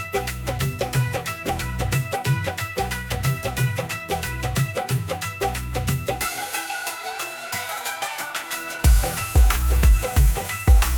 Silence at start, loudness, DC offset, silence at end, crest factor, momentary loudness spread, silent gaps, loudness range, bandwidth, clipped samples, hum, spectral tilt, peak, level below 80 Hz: 0 s; -24 LUFS; under 0.1%; 0 s; 18 dB; 9 LU; none; 5 LU; 19.5 kHz; under 0.1%; none; -4.5 dB/octave; -4 dBFS; -24 dBFS